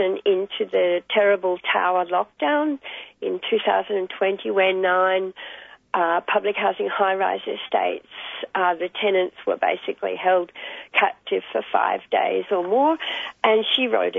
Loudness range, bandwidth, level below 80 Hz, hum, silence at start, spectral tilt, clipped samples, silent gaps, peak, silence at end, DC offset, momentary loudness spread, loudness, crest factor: 2 LU; 3.9 kHz; -72 dBFS; none; 0 s; -6 dB/octave; under 0.1%; none; -4 dBFS; 0 s; under 0.1%; 9 LU; -22 LUFS; 18 dB